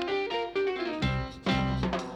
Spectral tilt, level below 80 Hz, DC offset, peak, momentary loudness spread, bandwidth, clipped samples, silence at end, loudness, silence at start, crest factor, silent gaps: -6.5 dB/octave; -42 dBFS; under 0.1%; -14 dBFS; 3 LU; 9.4 kHz; under 0.1%; 0 s; -30 LUFS; 0 s; 16 dB; none